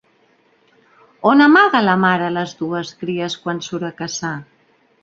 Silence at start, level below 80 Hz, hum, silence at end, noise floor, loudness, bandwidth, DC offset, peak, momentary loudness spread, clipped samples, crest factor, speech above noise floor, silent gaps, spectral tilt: 1.25 s; -62 dBFS; none; 0.6 s; -57 dBFS; -17 LUFS; 7.6 kHz; under 0.1%; -2 dBFS; 15 LU; under 0.1%; 16 dB; 41 dB; none; -5 dB/octave